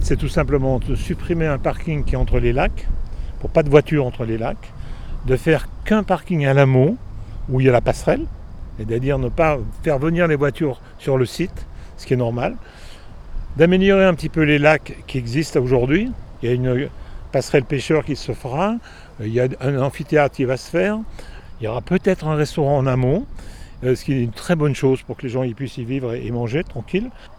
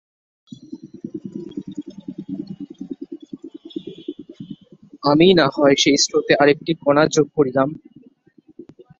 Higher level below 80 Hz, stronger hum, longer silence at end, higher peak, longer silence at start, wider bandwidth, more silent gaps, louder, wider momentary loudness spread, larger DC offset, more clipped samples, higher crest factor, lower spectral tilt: first, -30 dBFS vs -58 dBFS; neither; second, 0 s vs 0.35 s; about the same, 0 dBFS vs 0 dBFS; second, 0 s vs 0.7 s; first, 13.5 kHz vs 7.8 kHz; neither; second, -20 LUFS vs -16 LUFS; second, 16 LU vs 23 LU; neither; neither; about the same, 20 dB vs 20 dB; first, -7 dB/octave vs -4 dB/octave